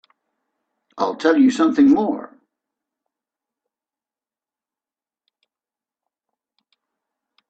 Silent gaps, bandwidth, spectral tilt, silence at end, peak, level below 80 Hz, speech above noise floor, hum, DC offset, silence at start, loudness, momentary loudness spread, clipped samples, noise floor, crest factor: none; 8.2 kHz; -5 dB/octave; 5.25 s; -2 dBFS; -66 dBFS; over 74 dB; none; under 0.1%; 0.95 s; -17 LUFS; 10 LU; under 0.1%; under -90 dBFS; 20 dB